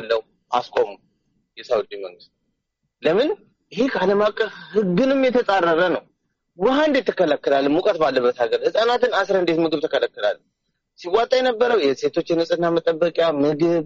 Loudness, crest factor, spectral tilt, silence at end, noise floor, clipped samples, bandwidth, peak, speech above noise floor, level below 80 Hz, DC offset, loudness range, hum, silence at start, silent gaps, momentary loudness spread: -20 LUFS; 16 dB; -3.5 dB/octave; 0 s; -75 dBFS; under 0.1%; 7.6 kHz; -4 dBFS; 56 dB; -60 dBFS; under 0.1%; 5 LU; none; 0 s; none; 7 LU